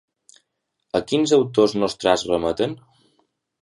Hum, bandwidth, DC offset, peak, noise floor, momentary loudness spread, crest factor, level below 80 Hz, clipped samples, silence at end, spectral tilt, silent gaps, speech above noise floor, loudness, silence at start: none; 11.5 kHz; under 0.1%; -2 dBFS; -75 dBFS; 9 LU; 20 dB; -54 dBFS; under 0.1%; 0.85 s; -5 dB/octave; none; 55 dB; -20 LUFS; 0.95 s